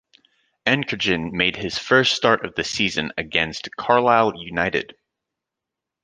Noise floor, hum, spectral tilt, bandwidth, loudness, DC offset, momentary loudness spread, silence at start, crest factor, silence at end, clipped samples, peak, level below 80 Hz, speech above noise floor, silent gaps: -85 dBFS; none; -4 dB/octave; 10 kHz; -20 LUFS; under 0.1%; 9 LU; 0.65 s; 20 dB; 1.2 s; under 0.1%; -2 dBFS; -52 dBFS; 64 dB; none